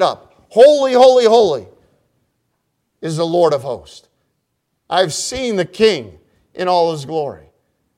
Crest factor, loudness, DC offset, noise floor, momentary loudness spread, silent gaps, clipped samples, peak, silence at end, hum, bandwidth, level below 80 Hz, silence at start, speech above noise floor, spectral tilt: 16 dB; -14 LUFS; under 0.1%; -71 dBFS; 16 LU; none; under 0.1%; 0 dBFS; 0.6 s; none; 13 kHz; -54 dBFS; 0 s; 57 dB; -4 dB/octave